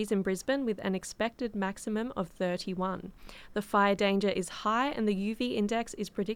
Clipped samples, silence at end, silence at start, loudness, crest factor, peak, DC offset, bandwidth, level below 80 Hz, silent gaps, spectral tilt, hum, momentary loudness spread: under 0.1%; 0 s; 0 s; -31 LUFS; 18 dB; -14 dBFS; under 0.1%; 16 kHz; -58 dBFS; none; -5 dB/octave; none; 9 LU